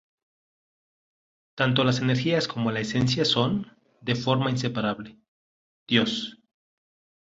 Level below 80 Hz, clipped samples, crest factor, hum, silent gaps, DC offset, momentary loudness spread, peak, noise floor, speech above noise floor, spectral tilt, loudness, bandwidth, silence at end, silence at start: -60 dBFS; under 0.1%; 22 dB; none; 5.28-5.86 s; under 0.1%; 12 LU; -6 dBFS; under -90 dBFS; over 65 dB; -5.5 dB/octave; -25 LUFS; 7.8 kHz; 0.95 s; 1.55 s